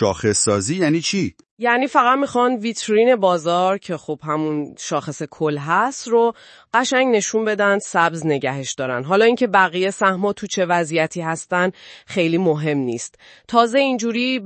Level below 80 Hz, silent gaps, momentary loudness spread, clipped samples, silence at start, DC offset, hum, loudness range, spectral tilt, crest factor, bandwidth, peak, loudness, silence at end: -62 dBFS; 1.51-1.57 s; 9 LU; under 0.1%; 0 s; under 0.1%; none; 3 LU; -4 dB/octave; 18 dB; 8.8 kHz; 0 dBFS; -19 LUFS; 0 s